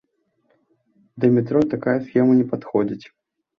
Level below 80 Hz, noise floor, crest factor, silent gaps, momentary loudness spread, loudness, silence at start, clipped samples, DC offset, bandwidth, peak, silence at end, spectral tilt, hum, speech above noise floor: -60 dBFS; -68 dBFS; 18 dB; none; 6 LU; -20 LUFS; 1.15 s; under 0.1%; under 0.1%; 5.4 kHz; -4 dBFS; 0.55 s; -10 dB/octave; none; 49 dB